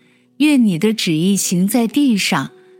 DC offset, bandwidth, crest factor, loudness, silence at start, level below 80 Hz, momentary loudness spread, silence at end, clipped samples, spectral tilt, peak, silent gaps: under 0.1%; 17 kHz; 12 dB; -15 LUFS; 0.4 s; -72 dBFS; 4 LU; 0.3 s; under 0.1%; -4.5 dB/octave; -4 dBFS; none